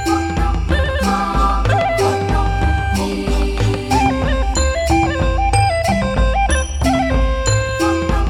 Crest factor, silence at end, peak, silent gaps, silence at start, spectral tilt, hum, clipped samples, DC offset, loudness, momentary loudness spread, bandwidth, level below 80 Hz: 14 dB; 0 s; -2 dBFS; none; 0 s; -5.5 dB/octave; none; under 0.1%; under 0.1%; -17 LUFS; 3 LU; 15 kHz; -20 dBFS